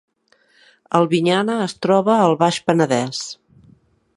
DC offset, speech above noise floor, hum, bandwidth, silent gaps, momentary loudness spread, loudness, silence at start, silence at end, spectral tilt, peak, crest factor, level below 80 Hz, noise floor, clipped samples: under 0.1%; 42 dB; none; 11.5 kHz; none; 11 LU; -18 LUFS; 0.9 s; 0.85 s; -5.5 dB/octave; 0 dBFS; 18 dB; -64 dBFS; -59 dBFS; under 0.1%